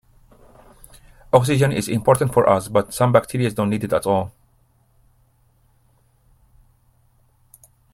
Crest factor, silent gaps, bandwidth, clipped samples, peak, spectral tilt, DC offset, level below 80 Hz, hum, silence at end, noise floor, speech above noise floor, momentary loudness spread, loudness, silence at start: 22 dB; none; 16 kHz; under 0.1%; 0 dBFS; -6 dB/octave; under 0.1%; -50 dBFS; none; 3.65 s; -59 dBFS; 42 dB; 6 LU; -19 LUFS; 1.35 s